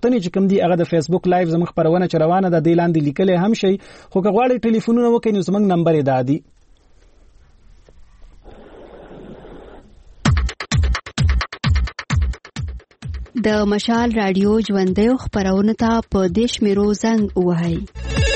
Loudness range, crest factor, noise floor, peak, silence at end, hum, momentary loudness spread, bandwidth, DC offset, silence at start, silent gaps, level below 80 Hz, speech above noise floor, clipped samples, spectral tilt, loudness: 7 LU; 14 dB; -50 dBFS; -4 dBFS; 0 s; none; 9 LU; 8.8 kHz; under 0.1%; 0.05 s; none; -30 dBFS; 33 dB; under 0.1%; -6.5 dB/octave; -18 LUFS